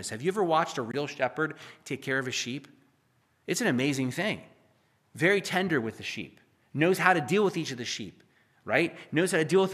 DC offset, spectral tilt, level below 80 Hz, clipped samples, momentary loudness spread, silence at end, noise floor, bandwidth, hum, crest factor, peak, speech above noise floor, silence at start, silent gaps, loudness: under 0.1%; -4.5 dB/octave; -76 dBFS; under 0.1%; 14 LU; 0 s; -69 dBFS; 15 kHz; none; 24 dB; -6 dBFS; 41 dB; 0 s; none; -28 LUFS